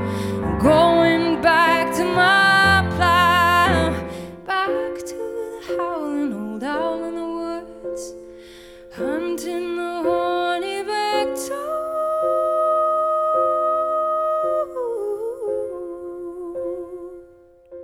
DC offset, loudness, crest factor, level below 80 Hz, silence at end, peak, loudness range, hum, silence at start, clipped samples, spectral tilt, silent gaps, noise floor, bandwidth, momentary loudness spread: under 0.1%; -20 LUFS; 18 dB; -46 dBFS; 0 s; -4 dBFS; 12 LU; none; 0 s; under 0.1%; -5 dB/octave; none; -49 dBFS; 17.5 kHz; 16 LU